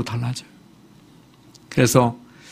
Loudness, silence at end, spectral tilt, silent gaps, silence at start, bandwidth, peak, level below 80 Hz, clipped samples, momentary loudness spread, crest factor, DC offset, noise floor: -20 LUFS; 0.35 s; -5.5 dB/octave; none; 0 s; 15.5 kHz; 0 dBFS; -52 dBFS; under 0.1%; 17 LU; 24 dB; under 0.1%; -50 dBFS